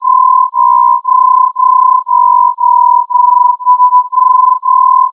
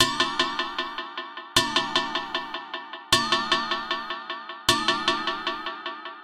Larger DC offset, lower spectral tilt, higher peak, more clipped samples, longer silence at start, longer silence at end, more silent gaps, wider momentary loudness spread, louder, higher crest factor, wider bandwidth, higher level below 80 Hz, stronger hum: neither; about the same, -2 dB/octave vs -1.5 dB/octave; about the same, 0 dBFS vs -2 dBFS; neither; about the same, 0 s vs 0 s; about the same, 0 s vs 0 s; neither; second, 1 LU vs 13 LU; first, -7 LUFS vs -25 LUFS; second, 8 dB vs 24 dB; second, 1.2 kHz vs 16.5 kHz; second, under -90 dBFS vs -54 dBFS; neither